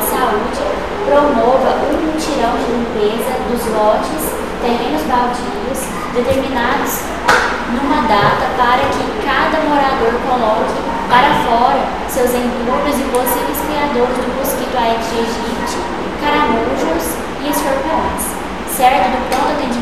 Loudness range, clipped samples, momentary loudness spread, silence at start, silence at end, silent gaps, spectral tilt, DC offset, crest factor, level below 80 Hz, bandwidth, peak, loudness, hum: 3 LU; under 0.1%; 7 LU; 0 s; 0 s; none; -4 dB/octave; 2%; 14 dB; -34 dBFS; 15.5 kHz; 0 dBFS; -15 LUFS; none